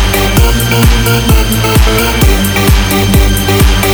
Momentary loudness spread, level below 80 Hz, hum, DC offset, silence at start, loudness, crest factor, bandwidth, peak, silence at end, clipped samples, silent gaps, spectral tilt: 1 LU; -12 dBFS; none; under 0.1%; 0 s; -9 LUFS; 8 dB; over 20 kHz; 0 dBFS; 0 s; 0.5%; none; -4.5 dB/octave